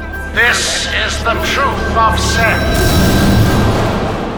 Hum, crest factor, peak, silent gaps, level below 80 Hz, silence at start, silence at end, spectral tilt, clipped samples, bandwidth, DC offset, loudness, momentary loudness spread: none; 12 dB; 0 dBFS; none; -20 dBFS; 0 s; 0 s; -4.5 dB/octave; under 0.1%; over 20 kHz; under 0.1%; -12 LUFS; 4 LU